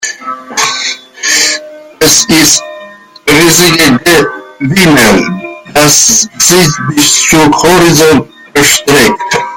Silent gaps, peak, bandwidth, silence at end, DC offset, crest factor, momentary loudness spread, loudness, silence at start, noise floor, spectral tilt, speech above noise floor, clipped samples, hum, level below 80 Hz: none; 0 dBFS; over 20 kHz; 0 s; under 0.1%; 8 dB; 12 LU; -6 LUFS; 0 s; -31 dBFS; -2.5 dB/octave; 24 dB; 2%; none; -34 dBFS